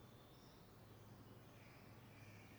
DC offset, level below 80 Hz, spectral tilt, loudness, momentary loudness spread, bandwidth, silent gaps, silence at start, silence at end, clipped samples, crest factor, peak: under 0.1%; -76 dBFS; -5.5 dB/octave; -63 LUFS; 2 LU; over 20 kHz; none; 0 s; 0 s; under 0.1%; 12 dB; -50 dBFS